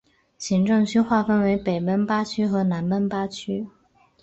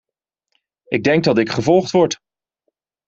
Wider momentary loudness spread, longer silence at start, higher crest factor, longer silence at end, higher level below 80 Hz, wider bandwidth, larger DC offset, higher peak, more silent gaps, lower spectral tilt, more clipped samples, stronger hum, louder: first, 10 LU vs 7 LU; second, 0.4 s vs 0.9 s; about the same, 16 dB vs 18 dB; second, 0.55 s vs 0.95 s; about the same, -56 dBFS vs -56 dBFS; about the same, 8.2 kHz vs 7.8 kHz; neither; second, -8 dBFS vs -2 dBFS; neither; about the same, -6.5 dB/octave vs -5.5 dB/octave; neither; neither; second, -23 LUFS vs -17 LUFS